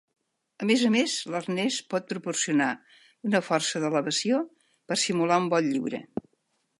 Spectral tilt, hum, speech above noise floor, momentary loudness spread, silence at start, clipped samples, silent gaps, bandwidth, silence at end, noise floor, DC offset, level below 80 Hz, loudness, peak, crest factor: -3.5 dB/octave; none; 48 dB; 11 LU; 0.6 s; under 0.1%; none; 11.5 kHz; 0.75 s; -74 dBFS; under 0.1%; -76 dBFS; -26 LUFS; -8 dBFS; 20 dB